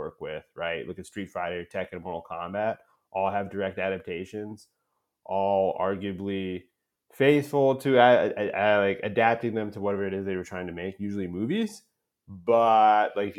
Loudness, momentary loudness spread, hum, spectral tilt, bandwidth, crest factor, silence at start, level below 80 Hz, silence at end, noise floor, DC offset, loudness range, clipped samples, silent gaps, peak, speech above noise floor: -26 LUFS; 16 LU; none; -6.5 dB/octave; 15.5 kHz; 22 dB; 0 s; -70 dBFS; 0 s; -60 dBFS; under 0.1%; 9 LU; under 0.1%; none; -4 dBFS; 34 dB